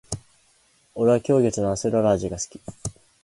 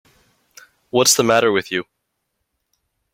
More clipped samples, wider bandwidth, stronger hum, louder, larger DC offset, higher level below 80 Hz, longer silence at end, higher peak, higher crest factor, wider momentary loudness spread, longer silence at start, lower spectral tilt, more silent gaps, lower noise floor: neither; second, 11.5 kHz vs 16.5 kHz; neither; second, -22 LUFS vs -16 LUFS; neither; first, -48 dBFS vs -62 dBFS; second, 0.35 s vs 1.3 s; second, -6 dBFS vs -2 dBFS; about the same, 18 dB vs 20 dB; first, 16 LU vs 12 LU; second, 0.1 s vs 0.95 s; first, -6 dB/octave vs -2.5 dB/octave; neither; second, -61 dBFS vs -75 dBFS